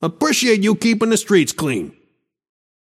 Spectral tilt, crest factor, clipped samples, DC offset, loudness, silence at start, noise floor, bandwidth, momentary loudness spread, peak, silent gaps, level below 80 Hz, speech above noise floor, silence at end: -4 dB/octave; 16 dB; under 0.1%; under 0.1%; -16 LUFS; 0 s; -64 dBFS; 15.5 kHz; 8 LU; -2 dBFS; none; -60 dBFS; 47 dB; 1 s